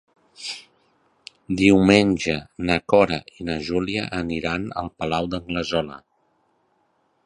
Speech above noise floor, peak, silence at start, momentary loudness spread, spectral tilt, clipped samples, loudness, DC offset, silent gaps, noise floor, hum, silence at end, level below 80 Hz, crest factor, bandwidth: 45 dB; 0 dBFS; 0.4 s; 16 LU; -5.5 dB/octave; under 0.1%; -22 LUFS; under 0.1%; none; -67 dBFS; none; 1.25 s; -46 dBFS; 24 dB; 11 kHz